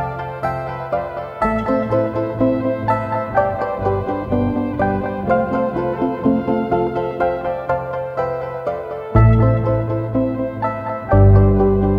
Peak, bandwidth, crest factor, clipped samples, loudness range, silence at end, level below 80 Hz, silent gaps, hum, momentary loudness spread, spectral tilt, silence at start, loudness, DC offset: 0 dBFS; 5.2 kHz; 16 dB; under 0.1%; 4 LU; 0 s; -30 dBFS; none; none; 10 LU; -10.5 dB/octave; 0 s; -19 LUFS; under 0.1%